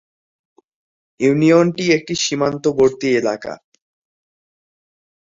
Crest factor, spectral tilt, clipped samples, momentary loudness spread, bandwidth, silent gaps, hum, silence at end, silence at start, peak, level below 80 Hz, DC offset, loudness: 18 dB; -5 dB/octave; under 0.1%; 12 LU; 7.8 kHz; none; none; 1.85 s; 1.2 s; -2 dBFS; -58 dBFS; under 0.1%; -16 LUFS